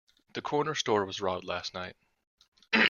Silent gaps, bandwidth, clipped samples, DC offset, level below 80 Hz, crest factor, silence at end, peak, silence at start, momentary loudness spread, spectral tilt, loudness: 2.27-2.37 s, 2.48-2.52 s; 7.2 kHz; under 0.1%; under 0.1%; -72 dBFS; 24 dB; 0 s; -8 dBFS; 0.35 s; 12 LU; -3.5 dB/octave; -32 LUFS